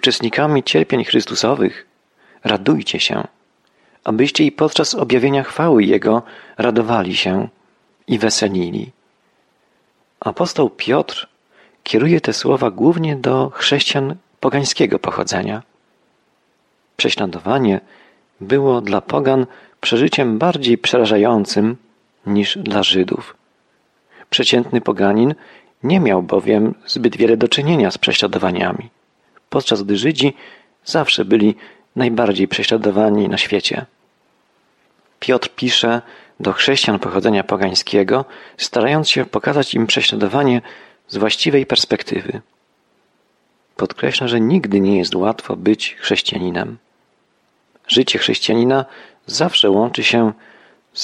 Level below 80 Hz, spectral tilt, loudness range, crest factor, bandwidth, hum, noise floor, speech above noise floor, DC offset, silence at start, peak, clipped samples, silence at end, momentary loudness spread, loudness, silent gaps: -58 dBFS; -4.5 dB/octave; 4 LU; 16 dB; 11.5 kHz; none; -62 dBFS; 46 dB; under 0.1%; 0.05 s; -2 dBFS; under 0.1%; 0 s; 11 LU; -16 LUFS; none